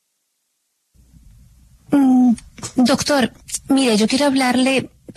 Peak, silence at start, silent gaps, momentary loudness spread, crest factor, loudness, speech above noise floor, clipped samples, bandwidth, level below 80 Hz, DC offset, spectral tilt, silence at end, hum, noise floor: -4 dBFS; 1.9 s; none; 8 LU; 14 dB; -17 LUFS; 54 dB; under 0.1%; 13.5 kHz; -50 dBFS; under 0.1%; -4 dB/octave; 0.05 s; none; -71 dBFS